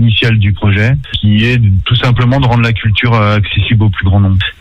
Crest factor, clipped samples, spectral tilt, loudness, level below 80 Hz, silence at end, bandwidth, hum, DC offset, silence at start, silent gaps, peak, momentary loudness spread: 8 dB; under 0.1%; -7.5 dB/octave; -10 LUFS; -26 dBFS; 0.1 s; 6.6 kHz; none; under 0.1%; 0 s; none; 0 dBFS; 2 LU